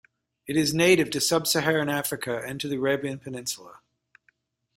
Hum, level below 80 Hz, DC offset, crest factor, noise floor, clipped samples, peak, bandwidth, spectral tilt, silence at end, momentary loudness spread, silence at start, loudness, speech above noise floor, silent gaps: none; -62 dBFS; under 0.1%; 20 dB; -69 dBFS; under 0.1%; -6 dBFS; 16 kHz; -3.5 dB/octave; 1.05 s; 13 LU; 0.45 s; -25 LUFS; 43 dB; none